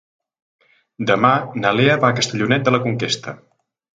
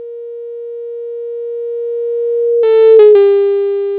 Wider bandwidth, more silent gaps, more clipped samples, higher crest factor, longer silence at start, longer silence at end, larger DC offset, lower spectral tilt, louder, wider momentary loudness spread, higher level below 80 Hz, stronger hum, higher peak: first, 9.4 kHz vs 4 kHz; neither; neither; first, 18 dB vs 12 dB; first, 1 s vs 0 s; first, 0.6 s vs 0 s; neither; second, -5 dB/octave vs -7.5 dB/octave; second, -17 LUFS vs -10 LUFS; second, 8 LU vs 20 LU; first, -58 dBFS vs -68 dBFS; second, none vs 50 Hz at -70 dBFS; about the same, 0 dBFS vs 0 dBFS